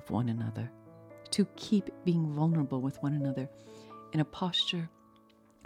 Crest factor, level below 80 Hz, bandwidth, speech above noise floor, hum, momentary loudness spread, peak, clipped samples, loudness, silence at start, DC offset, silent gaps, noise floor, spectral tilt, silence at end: 18 dB; -68 dBFS; 12.5 kHz; 30 dB; none; 16 LU; -16 dBFS; under 0.1%; -32 LUFS; 0 s; under 0.1%; none; -62 dBFS; -6 dB/octave; 0.75 s